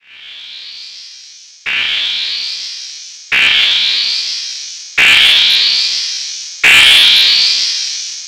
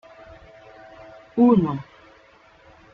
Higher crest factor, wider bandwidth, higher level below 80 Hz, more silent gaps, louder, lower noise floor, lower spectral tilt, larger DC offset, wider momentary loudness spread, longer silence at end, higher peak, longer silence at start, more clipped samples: second, 12 dB vs 20 dB; first, over 20 kHz vs 5 kHz; first, -50 dBFS vs -56 dBFS; neither; first, -8 LUFS vs -20 LUFS; second, -37 dBFS vs -53 dBFS; second, 2 dB/octave vs -10.5 dB/octave; neither; second, 23 LU vs 27 LU; second, 0 s vs 1.1 s; first, 0 dBFS vs -4 dBFS; second, 0.15 s vs 1.35 s; first, 0.4% vs under 0.1%